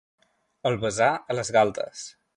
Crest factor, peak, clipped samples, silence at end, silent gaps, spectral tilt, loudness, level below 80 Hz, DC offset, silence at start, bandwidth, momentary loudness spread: 20 dB; -6 dBFS; under 0.1%; 0.25 s; none; -4 dB/octave; -25 LUFS; -60 dBFS; under 0.1%; 0.65 s; 11.5 kHz; 12 LU